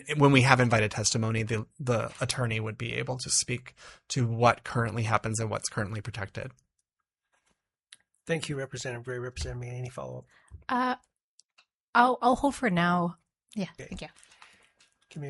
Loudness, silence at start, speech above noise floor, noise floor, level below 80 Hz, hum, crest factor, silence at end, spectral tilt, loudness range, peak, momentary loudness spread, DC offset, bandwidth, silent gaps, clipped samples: -28 LUFS; 0 s; 58 dB; -87 dBFS; -54 dBFS; none; 26 dB; 0 s; -4.5 dB/octave; 9 LU; -4 dBFS; 19 LU; under 0.1%; 11.5 kHz; 11.21-11.38 s, 11.74-11.93 s; under 0.1%